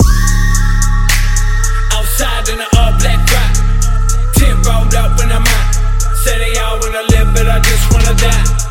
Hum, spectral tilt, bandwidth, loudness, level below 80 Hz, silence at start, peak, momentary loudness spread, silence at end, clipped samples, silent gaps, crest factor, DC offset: none; -4 dB/octave; 17 kHz; -13 LUFS; -10 dBFS; 0 s; 0 dBFS; 4 LU; 0 s; under 0.1%; none; 10 dB; under 0.1%